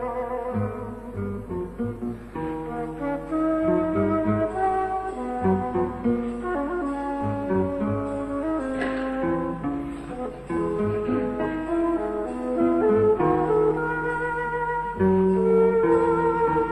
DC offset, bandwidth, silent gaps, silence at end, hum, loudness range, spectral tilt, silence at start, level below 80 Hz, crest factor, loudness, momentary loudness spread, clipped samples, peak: under 0.1%; 10.5 kHz; none; 0 s; none; 6 LU; -9 dB/octave; 0 s; -44 dBFS; 14 dB; -25 LUFS; 11 LU; under 0.1%; -10 dBFS